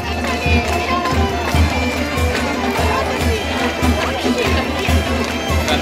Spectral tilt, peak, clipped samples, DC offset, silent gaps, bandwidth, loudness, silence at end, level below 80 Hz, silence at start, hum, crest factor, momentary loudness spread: -5 dB/octave; -2 dBFS; under 0.1%; under 0.1%; none; 16 kHz; -17 LUFS; 0 s; -24 dBFS; 0 s; none; 14 dB; 2 LU